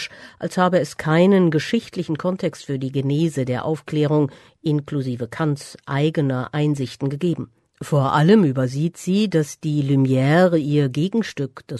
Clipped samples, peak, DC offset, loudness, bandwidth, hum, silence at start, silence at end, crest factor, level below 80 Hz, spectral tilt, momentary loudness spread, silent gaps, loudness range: under 0.1%; -2 dBFS; under 0.1%; -20 LUFS; 12.5 kHz; none; 0 s; 0 s; 16 dB; -60 dBFS; -7 dB/octave; 11 LU; none; 5 LU